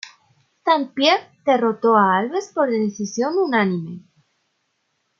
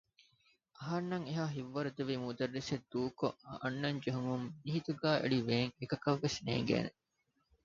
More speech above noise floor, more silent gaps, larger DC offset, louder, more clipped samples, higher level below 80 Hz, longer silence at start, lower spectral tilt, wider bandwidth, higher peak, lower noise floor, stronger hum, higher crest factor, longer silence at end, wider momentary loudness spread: first, 52 dB vs 44 dB; neither; neither; first, -19 LUFS vs -37 LUFS; neither; about the same, -72 dBFS vs -68 dBFS; second, 0.05 s vs 0.8 s; about the same, -5 dB/octave vs -5 dB/octave; about the same, 7.2 kHz vs 7.4 kHz; first, -2 dBFS vs -18 dBFS; second, -71 dBFS vs -81 dBFS; neither; about the same, 18 dB vs 20 dB; first, 1.2 s vs 0.75 s; first, 11 LU vs 7 LU